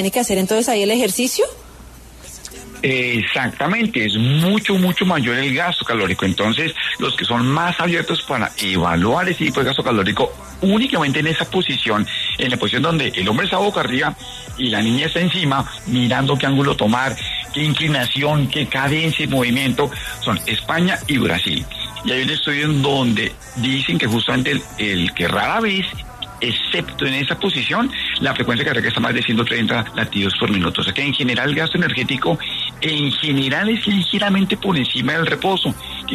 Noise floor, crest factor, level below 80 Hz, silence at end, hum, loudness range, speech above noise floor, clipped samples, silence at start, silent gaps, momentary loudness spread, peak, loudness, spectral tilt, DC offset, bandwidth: -39 dBFS; 14 dB; -44 dBFS; 0 s; none; 2 LU; 21 dB; under 0.1%; 0 s; none; 4 LU; -4 dBFS; -18 LUFS; -4.5 dB/octave; under 0.1%; 13.5 kHz